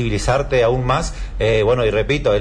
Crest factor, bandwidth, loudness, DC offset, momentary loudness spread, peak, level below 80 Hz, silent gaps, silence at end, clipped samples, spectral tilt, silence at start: 10 dB; 10.5 kHz; -18 LUFS; under 0.1%; 5 LU; -6 dBFS; -28 dBFS; none; 0 s; under 0.1%; -5.5 dB/octave; 0 s